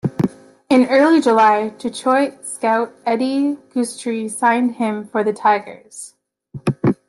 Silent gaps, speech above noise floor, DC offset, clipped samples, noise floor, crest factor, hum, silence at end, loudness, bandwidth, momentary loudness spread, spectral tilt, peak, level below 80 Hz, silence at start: none; 21 dB; under 0.1%; under 0.1%; -38 dBFS; 16 dB; none; 0.15 s; -18 LUFS; 12.5 kHz; 12 LU; -5.5 dB/octave; -2 dBFS; -60 dBFS; 0.05 s